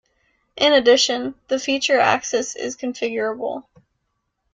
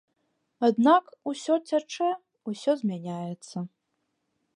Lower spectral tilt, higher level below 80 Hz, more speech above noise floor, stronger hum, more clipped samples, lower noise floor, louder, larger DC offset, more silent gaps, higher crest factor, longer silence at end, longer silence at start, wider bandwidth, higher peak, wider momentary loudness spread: second, -1.5 dB/octave vs -6 dB/octave; first, -62 dBFS vs -82 dBFS; about the same, 55 dB vs 52 dB; neither; neither; second, -74 dBFS vs -78 dBFS; first, -19 LUFS vs -27 LUFS; neither; neither; about the same, 18 dB vs 20 dB; about the same, 0.9 s vs 0.9 s; about the same, 0.55 s vs 0.6 s; second, 9.4 kHz vs 11 kHz; first, -2 dBFS vs -8 dBFS; second, 12 LU vs 16 LU